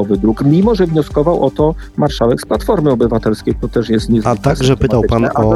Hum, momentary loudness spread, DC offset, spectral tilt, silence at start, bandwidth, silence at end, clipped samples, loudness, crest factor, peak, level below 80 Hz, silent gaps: none; 5 LU; under 0.1%; -7.5 dB/octave; 0 s; 12.5 kHz; 0 s; under 0.1%; -14 LUFS; 12 dB; 0 dBFS; -28 dBFS; none